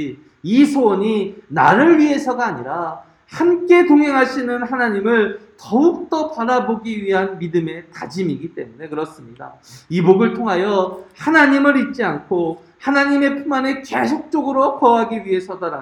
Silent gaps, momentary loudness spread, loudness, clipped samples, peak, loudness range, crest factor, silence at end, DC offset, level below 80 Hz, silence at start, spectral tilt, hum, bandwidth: none; 15 LU; -17 LUFS; under 0.1%; 0 dBFS; 6 LU; 16 dB; 0 s; under 0.1%; -60 dBFS; 0 s; -6.5 dB/octave; none; 11 kHz